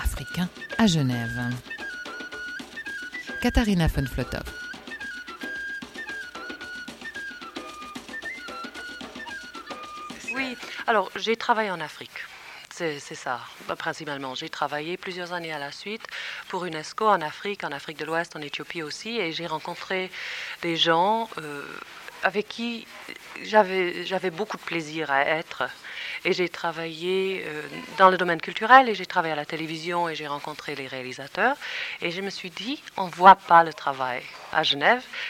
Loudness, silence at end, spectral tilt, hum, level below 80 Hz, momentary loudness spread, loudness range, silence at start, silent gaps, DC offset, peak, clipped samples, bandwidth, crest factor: -26 LUFS; 0 s; -4.5 dB/octave; none; -44 dBFS; 16 LU; 13 LU; 0 s; none; under 0.1%; -2 dBFS; under 0.1%; 17 kHz; 24 dB